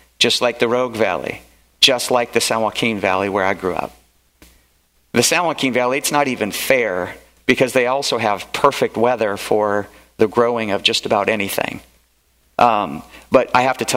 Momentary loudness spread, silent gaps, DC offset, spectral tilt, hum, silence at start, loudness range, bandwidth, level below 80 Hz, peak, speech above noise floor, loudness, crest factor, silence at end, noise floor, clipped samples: 10 LU; none; under 0.1%; -3 dB/octave; none; 0.2 s; 2 LU; 16.5 kHz; -54 dBFS; 0 dBFS; 41 dB; -17 LUFS; 18 dB; 0 s; -59 dBFS; under 0.1%